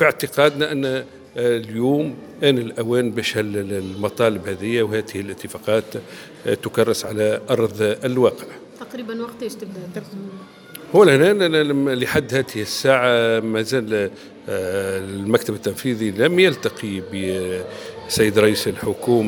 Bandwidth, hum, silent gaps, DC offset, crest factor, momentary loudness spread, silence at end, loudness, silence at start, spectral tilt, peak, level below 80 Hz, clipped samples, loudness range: 19.5 kHz; none; none; under 0.1%; 20 dB; 17 LU; 0 s; -20 LUFS; 0 s; -5 dB/octave; 0 dBFS; -56 dBFS; under 0.1%; 5 LU